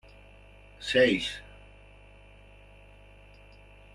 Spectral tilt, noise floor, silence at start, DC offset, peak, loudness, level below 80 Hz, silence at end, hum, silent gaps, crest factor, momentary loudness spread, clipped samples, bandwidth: -4 dB/octave; -53 dBFS; 0.8 s; under 0.1%; -10 dBFS; -26 LUFS; -54 dBFS; 2.5 s; 50 Hz at -55 dBFS; none; 22 dB; 21 LU; under 0.1%; 12 kHz